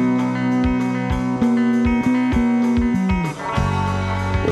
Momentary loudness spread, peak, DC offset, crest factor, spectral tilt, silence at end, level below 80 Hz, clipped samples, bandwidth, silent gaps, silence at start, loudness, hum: 4 LU; -6 dBFS; under 0.1%; 12 dB; -7.5 dB/octave; 0 s; -32 dBFS; under 0.1%; 11 kHz; none; 0 s; -19 LUFS; none